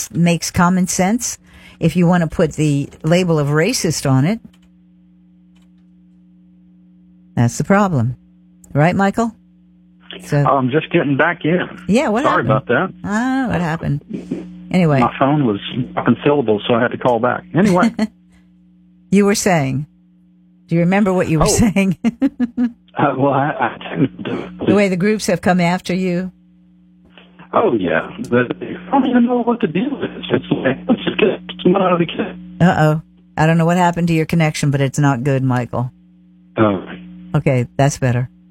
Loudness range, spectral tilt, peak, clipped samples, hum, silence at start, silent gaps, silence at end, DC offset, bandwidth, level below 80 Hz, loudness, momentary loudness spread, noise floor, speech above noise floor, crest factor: 3 LU; -6 dB/octave; -2 dBFS; under 0.1%; none; 0 s; none; 0.25 s; under 0.1%; 16.5 kHz; -44 dBFS; -16 LUFS; 9 LU; -50 dBFS; 35 dB; 14 dB